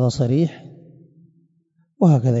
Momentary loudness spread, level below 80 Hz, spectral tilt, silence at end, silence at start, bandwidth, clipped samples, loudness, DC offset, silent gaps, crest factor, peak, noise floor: 10 LU; -56 dBFS; -8.5 dB/octave; 0 s; 0 s; 7.8 kHz; under 0.1%; -19 LUFS; under 0.1%; none; 16 dB; -4 dBFS; -63 dBFS